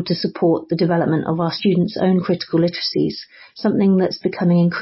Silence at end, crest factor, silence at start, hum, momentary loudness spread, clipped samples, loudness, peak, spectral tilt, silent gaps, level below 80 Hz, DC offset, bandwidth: 0 s; 12 dB; 0 s; none; 6 LU; under 0.1%; -18 LUFS; -6 dBFS; -10.5 dB/octave; none; -56 dBFS; under 0.1%; 5.8 kHz